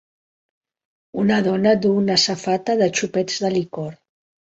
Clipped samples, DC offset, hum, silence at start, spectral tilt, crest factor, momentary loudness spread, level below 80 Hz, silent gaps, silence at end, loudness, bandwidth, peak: under 0.1%; under 0.1%; none; 1.15 s; -4.5 dB/octave; 18 dB; 13 LU; -62 dBFS; none; 0.65 s; -19 LUFS; 8 kHz; -4 dBFS